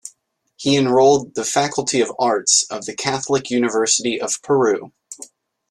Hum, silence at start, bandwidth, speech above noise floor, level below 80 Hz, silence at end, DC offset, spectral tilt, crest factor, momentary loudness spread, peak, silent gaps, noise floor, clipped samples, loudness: none; 0.05 s; 12.5 kHz; 43 dB; -60 dBFS; 0.45 s; under 0.1%; -3 dB/octave; 18 dB; 12 LU; -2 dBFS; none; -61 dBFS; under 0.1%; -18 LUFS